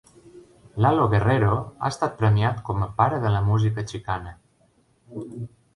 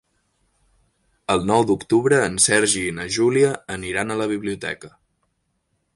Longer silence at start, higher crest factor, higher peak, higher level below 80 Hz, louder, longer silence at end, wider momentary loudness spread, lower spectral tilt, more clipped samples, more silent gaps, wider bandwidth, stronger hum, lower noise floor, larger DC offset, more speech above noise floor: second, 0.25 s vs 1.3 s; about the same, 18 dB vs 20 dB; second, -6 dBFS vs -2 dBFS; first, -44 dBFS vs -52 dBFS; second, -23 LUFS vs -20 LUFS; second, 0.3 s vs 1.1 s; first, 18 LU vs 13 LU; first, -7.5 dB/octave vs -3.5 dB/octave; neither; neither; about the same, 11 kHz vs 11.5 kHz; neither; second, -62 dBFS vs -71 dBFS; neither; second, 40 dB vs 51 dB